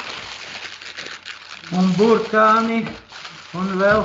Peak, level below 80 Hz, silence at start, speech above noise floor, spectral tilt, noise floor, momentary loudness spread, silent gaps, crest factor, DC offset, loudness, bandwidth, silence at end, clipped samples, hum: -2 dBFS; -52 dBFS; 0 s; 21 dB; -6 dB/octave; -38 dBFS; 19 LU; none; 18 dB; under 0.1%; -18 LUFS; 7.8 kHz; 0 s; under 0.1%; none